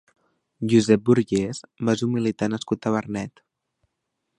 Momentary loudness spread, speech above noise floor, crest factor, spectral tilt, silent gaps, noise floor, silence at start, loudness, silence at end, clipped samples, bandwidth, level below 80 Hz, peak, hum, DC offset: 13 LU; 57 dB; 20 dB; -6.5 dB/octave; none; -79 dBFS; 0.6 s; -23 LUFS; 1.1 s; under 0.1%; 11.5 kHz; -58 dBFS; -4 dBFS; none; under 0.1%